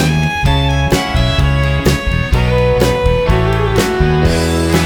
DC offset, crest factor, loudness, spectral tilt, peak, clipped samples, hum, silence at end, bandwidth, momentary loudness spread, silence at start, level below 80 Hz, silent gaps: under 0.1%; 12 dB; -13 LUFS; -5.5 dB/octave; 0 dBFS; under 0.1%; none; 0 s; over 20 kHz; 2 LU; 0 s; -18 dBFS; none